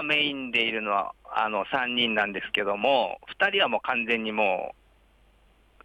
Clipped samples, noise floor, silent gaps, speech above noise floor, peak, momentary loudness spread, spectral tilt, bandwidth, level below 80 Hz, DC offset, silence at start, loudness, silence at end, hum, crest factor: under 0.1%; -60 dBFS; none; 34 dB; -10 dBFS; 5 LU; -4.5 dB/octave; 14 kHz; -62 dBFS; under 0.1%; 0 s; -25 LUFS; 1.15 s; none; 18 dB